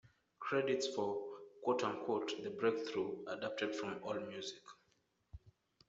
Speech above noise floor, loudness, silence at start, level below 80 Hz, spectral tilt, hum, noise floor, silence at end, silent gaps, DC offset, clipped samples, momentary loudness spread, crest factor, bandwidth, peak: 39 dB; -40 LUFS; 0.05 s; -74 dBFS; -4.5 dB/octave; none; -79 dBFS; 0.4 s; none; under 0.1%; under 0.1%; 12 LU; 18 dB; 8 kHz; -22 dBFS